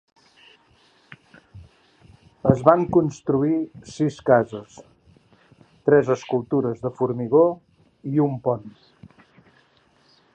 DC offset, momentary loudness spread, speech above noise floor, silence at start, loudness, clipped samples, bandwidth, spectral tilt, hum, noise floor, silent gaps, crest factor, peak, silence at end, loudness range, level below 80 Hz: under 0.1%; 11 LU; 39 dB; 1.55 s; -21 LUFS; under 0.1%; 8.8 kHz; -8 dB/octave; none; -60 dBFS; none; 24 dB; 0 dBFS; 1.65 s; 3 LU; -54 dBFS